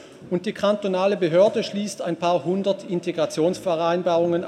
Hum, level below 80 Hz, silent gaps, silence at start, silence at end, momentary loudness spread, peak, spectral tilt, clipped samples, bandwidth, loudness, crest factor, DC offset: none; -68 dBFS; none; 0 s; 0 s; 9 LU; -6 dBFS; -6 dB/octave; under 0.1%; 13 kHz; -23 LUFS; 18 dB; under 0.1%